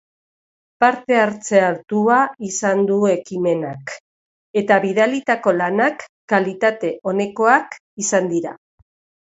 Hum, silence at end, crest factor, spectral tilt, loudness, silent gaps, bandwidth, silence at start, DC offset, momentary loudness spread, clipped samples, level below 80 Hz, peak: none; 0.8 s; 18 dB; -4.5 dB/octave; -18 LUFS; 4.00-4.54 s, 6.09-6.28 s, 7.80-7.97 s; 8.2 kHz; 0.8 s; under 0.1%; 9 LU; under 0.1%; -66 dBFS; 0 dBFS